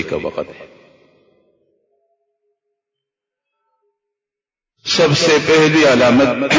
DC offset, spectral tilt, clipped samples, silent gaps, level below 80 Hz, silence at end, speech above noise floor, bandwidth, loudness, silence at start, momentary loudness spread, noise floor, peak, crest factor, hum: under 0.1%; -4.5 dB/octave; under 0.1%; none; -50 dBFS; 0 s; 75 dB; 7.6 kHz; -12 LUFS; 0 s; 17 LU; -88 dBFS; -2 dBFS; 16 dB; none